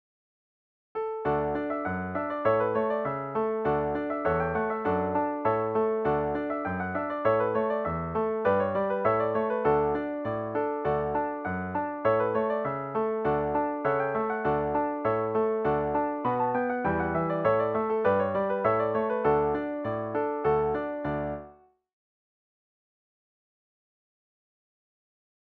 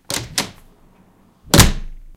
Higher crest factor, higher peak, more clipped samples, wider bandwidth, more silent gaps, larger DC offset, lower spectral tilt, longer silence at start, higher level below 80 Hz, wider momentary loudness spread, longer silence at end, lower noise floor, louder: about the same, 16 dB vs 20 dB; second, -12 dBFS vs 0 dBFS; second, under 0.1% vs 0.2%; second, 4.6 kHz vs 17 kHz; neither; neither; first, -10 dB/octave vs -3.5 dB/octave; first, 0.95 s vs 0.1 s; second, -54 dBFS vs -26 dBFS; second, 6 LU vs 18 LU; first, 4.05 s vs 0.05 s; about the same, -54 dBFS vs -52 dBFS; second, -28 LUFS vs -16 LUFS